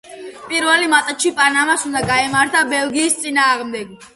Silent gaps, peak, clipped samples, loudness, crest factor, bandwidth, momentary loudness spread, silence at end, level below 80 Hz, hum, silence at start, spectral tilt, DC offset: none; 0 dBFS; under 0.1%; -15 LUFS; 18 dB; 12 kHz; 10 LU; 0.1 s; -52 dBFS; none; 0.1 s; -2 dB/octave; under 0.1%